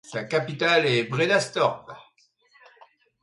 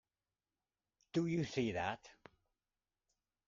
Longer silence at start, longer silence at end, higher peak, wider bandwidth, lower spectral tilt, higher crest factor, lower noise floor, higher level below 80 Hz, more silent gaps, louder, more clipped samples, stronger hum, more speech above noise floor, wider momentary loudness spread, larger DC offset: second, 0.1 s vs 1.15 s; second, 1.2 s vs 1.35 s; first, -6 dBFS vs -24 dBFS; first, 11.5 kHz vs 7.6 kHz; second, -4.5 dB/octave vs -6 dB/octave; about the same, 18 dB vs 20 dB; second, -63 dBFS vs under -90 dBFS; about the same, -70 dBFS vs -72 dBFS; neither; first, -23 LUFS vs -39 LUFS; neither; neither; second, 39 dB vs over 52 dB; first, 9 LU vs 5 LU; neither